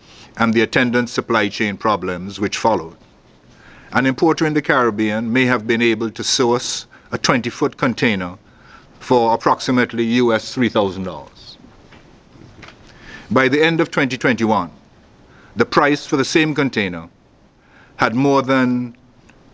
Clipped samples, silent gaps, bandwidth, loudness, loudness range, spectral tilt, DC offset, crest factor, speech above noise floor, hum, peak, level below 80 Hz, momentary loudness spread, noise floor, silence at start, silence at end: under 0.1%; none; 8 kHz; -17 LUFS; 3 LU; -4.5 dB/octave; under 0.1%; 18 dB; 34 dB; none; 0 dBFS; -52 dBFS; 11 LU; -51 dBFS; 0.2 s; 0.6 s